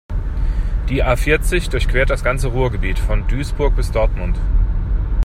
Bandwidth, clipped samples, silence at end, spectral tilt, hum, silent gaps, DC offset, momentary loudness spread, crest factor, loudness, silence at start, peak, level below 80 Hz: 13.5 kHz; under 0.1%; 0 s; -6 dB/octave; none; none; under 0.1%; 6 LU; 14 dB; -19 LUFS; 0.1 s; -2 dBFS; -18 dBFS